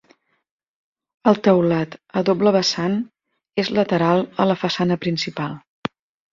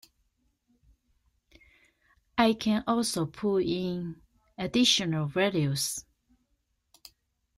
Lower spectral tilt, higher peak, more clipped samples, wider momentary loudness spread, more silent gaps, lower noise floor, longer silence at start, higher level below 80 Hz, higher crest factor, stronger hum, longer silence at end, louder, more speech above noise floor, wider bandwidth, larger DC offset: first, -6 dB/octave vs -4 dB/octave; first, -2 dBFS vs -10 dBFS; neither; about the same, 13 LU vs 12 LU; neither; second, -59 dBFS vs -76 dBFS; second, 1.25 s vs 2.35 s; about the same, -60 dBFS vs -62 dBFS; about the same, 20 dB vs 20 dB; neither; second, 0.75 s vs 1.55 s; first, -20 LUFS vs -28 LUFS; second, 40 dB vs 48 dB; second, 7.6 kHz vs 16 kHz; neither